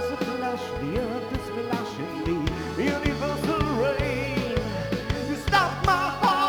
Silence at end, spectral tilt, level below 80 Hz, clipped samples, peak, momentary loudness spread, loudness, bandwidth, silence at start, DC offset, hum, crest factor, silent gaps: 0 s; -5.5 dB/octave; -38 dBFS; under 0.1%; -6 dBFS; 7 LU; -26 LUFS; over 20 kHz; 0 s; under 0.1%; none; 18 dB; none